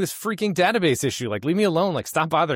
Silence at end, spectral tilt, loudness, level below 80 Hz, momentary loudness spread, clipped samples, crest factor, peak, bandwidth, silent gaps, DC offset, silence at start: 0 s; -4.5 dB/octave; -22 LUFS; -60 dBFS; 6 LU; under 0.1%; 14 dB; -8 dBFS; 16.5 kHz; none; under 0.1%; 0 s